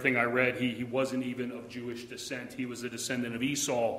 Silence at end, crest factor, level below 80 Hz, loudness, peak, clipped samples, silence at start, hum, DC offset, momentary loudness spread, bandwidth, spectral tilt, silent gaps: 0 s; 22 dB; -68 dBFS; -32 LUFS; -10 dBFS; under 0.1%; 0 s; none; under 0.1%; 13 LU; 15.5 kHz; -4 dB/octave; none